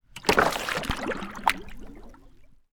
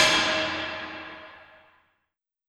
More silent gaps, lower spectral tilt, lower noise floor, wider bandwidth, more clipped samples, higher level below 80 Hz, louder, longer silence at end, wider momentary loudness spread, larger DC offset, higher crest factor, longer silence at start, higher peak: neither; first, -3.5 dB/octave vs -1.5 dB/octave; second, -51 dBFS vs -81 dBFS; first, over 20 kHz vs 17.5 kHz; neither; first, -44 dBFS vs -64 dBFS; about the same, -26 LUFS vs -25 LUFS; second, 0.15 s vs 1.05 s; about the same, 24 LU vs 22 LU; neither; first, 28 dB vs 22 dB; first, 0.15 s vs 0 s; first, 0 dBFS vs -8 dBFS